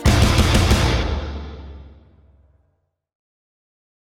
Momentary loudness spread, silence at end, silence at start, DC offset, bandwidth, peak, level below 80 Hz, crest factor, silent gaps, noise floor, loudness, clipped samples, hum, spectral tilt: 21 LU; 2.2 s; 0 s; under 0.1%; 17 kHz; -2 dBFS; -26 dBFS; 18 dB; none; -68 dBFS; -18 LUFS; under 0.1%; none; -5 dB/octave